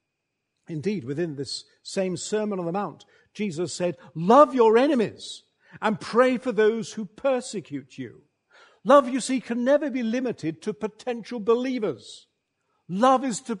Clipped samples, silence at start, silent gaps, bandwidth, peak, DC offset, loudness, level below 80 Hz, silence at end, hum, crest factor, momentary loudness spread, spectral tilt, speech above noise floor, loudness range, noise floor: under 0.1%; 0.7 s; none; 10.5 kHz; -2 dBFS; under 0.1%; -24 LUFS; -72 dBFS; 0 s; none; 22 dB; 16 LU; -5 dB/octave; 56 dB; 8 LU; -80 dBFS